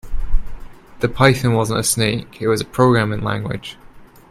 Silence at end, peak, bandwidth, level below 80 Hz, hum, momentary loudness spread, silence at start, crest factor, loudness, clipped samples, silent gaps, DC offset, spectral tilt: 0.25 s; 0 dBFS; 14 kHz; -28 dBFS; none; 14 LU; 0.05 s; 18 dB; -18 LUFS; under 0.1%; none; under 0.1%; -5 dB/octave